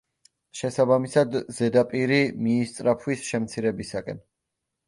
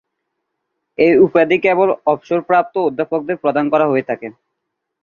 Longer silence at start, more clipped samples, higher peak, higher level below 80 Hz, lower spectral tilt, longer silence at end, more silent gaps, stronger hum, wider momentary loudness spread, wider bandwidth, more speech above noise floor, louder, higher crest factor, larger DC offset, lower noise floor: second, 0.55 s vs 1 s; neither; second, -6 dBFS vs 0 dBFS; about the same, -62 dBFS vs -60 dBFS; second, -6 dB/octave vs -8 dB/octave; about the same, 0.7 s vs 0.7 s; neither; neither; about the same, 11 LU vs 11 LU; first, 11.5 kHz vs 6.8 kHz; about the same, 59 dB vs 61 dB; second, -24 LUFS vs -15 LUFS; about the same, 18 dB vs 16 dB; neither; first, -83 dBFS vs -76 dBFS